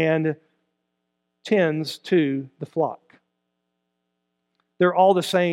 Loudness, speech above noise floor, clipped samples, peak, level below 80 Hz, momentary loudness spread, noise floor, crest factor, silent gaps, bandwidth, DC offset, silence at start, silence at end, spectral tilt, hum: -22 LUFS; 56 dB; under 0.1%; -4 dBFS; -78 dBFS; 13 LU; -77 dBFS; 18 dB; none; 16 kHz; under 0.1%; 0 s; 0 s; -6 dB/octave; none